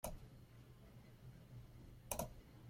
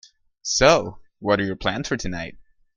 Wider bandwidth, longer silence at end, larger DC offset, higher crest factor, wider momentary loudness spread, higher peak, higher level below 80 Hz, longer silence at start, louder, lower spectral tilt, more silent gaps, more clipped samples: first, 16.5 kHz vs 10 kHz; second, 0 s vs 0.35 s; neither; about the same, 28 dB vs 24 dB; about the same, 16 LU vs 17 LU; second, -24 dBFS vs 0 dBFS; second, -62 dBFS vs -42 dBFS; second, 0.05 s vs 0.45 s; second, -54 LUFS vs -21 LUFS; about the same, -4 dB/octave vs -3.5 dB/octave; neither; neither